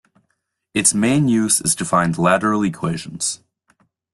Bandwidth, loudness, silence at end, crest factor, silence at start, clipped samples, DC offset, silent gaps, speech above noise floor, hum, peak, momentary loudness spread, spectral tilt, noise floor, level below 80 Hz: 12.5 kHz; -18 LUFS; 0.8 s; 18 dB; 0.75 s; under 0.1%; under 0.1%; none; 54 dB; none; -2 dBFS; 9 LU; -4 dB/octave; -71 dBFS; -54 dBFS